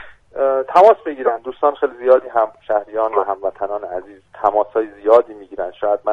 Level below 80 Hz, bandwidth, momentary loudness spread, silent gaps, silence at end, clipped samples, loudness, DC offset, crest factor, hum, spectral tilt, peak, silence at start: -58 dBFS; 7.6 kHz; 14 LU; none; 0 s; under 0.1%; -17 LUFS; under 0.1%; 18 dB; none; -6 dB/octave; 0 dBFS; 0 s